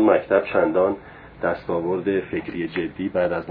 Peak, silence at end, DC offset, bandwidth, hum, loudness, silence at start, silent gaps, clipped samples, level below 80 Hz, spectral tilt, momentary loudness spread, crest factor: -4 dBFS; 0 s; under 0.1%; 5 kHz; none; -23 LUFS; 0 s; none; under 0.1%; -52 dBFS; -10.5 dB/octave; 9 LU; 18 dB